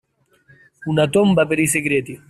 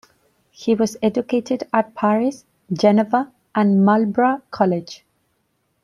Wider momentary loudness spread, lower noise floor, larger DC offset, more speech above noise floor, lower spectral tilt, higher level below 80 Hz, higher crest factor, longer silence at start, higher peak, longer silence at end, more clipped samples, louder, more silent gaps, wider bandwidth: second, 7 LU vs 10 LU; second, -56 dBFS vs -68 dBFS; neither; second, 39 dB vs 50 dB; second, -5 dB/octave vs -7 dB/octave; first, -54 dBFS vs -64 dBFS; about the same, 14 dB vs 18 dB; first, 0.8 s vs 0.6 s; about the same, -4 dBFS vs -2 dBFS; second, 0.15 s vs 0.9 s; neither; about the same, -17 LUFS vs -19 LUFS; neither; first, 15.5 kHz vs 11 kHz